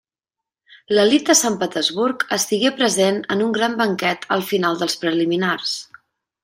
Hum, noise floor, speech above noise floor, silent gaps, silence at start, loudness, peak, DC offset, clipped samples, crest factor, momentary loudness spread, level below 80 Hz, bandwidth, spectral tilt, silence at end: none; -86 dBFS; 68 dB; none; 0.7 s; -19 LUFS; -2 dBFS; under 0.1%; under 0.1%; 18 dB; 6 LU; -66 dBFS; 16 kHz; -3 dB/octave; 0.6 s